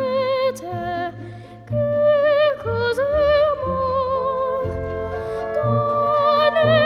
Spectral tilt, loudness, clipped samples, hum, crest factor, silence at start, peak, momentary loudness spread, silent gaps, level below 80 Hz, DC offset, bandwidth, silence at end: -6.5 dB/octave; -20 LUFS; under 0.1%; none; 14 dB; 0 s; -6 dBFS; 11 LU; none; -44 dBFS; under 0.1%; 12 kHz; 0 s